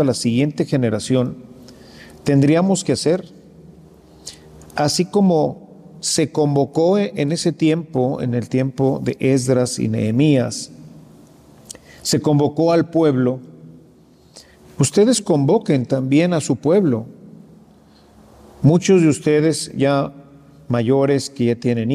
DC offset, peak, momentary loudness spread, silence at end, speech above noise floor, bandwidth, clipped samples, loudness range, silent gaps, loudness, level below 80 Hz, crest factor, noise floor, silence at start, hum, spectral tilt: under 0.1%; -2 dBFS; 11 LU; 0 s; 33 dB; 15 kHz; under 0.1%; 3 LU; none; -18 LUFS; -56 dBFS; 16 dB; -49 dBFS; 0 s; none; -6 dB/octave